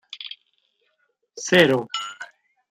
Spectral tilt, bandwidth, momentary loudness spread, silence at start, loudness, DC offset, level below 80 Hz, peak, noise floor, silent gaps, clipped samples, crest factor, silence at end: -4 dB/octave; 15.5 kHz; 24 LU; 0.15 s; -20 LUFS; under 0.1%; -64 dBFS; -4 dBFS; -70 dBFS; none; under 0.1%; 22 dB; 0.45 s